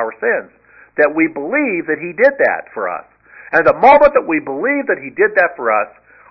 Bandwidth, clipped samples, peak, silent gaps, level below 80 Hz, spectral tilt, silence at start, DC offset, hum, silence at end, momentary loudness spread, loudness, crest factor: 6 kHz; under 0.1%; 0 dBFS; none; -50 dBFS; -7.5 dB/octave; 0 s; under 0.1%; none; 0.4 s; 13 LU; -14 LUFS; 16 dB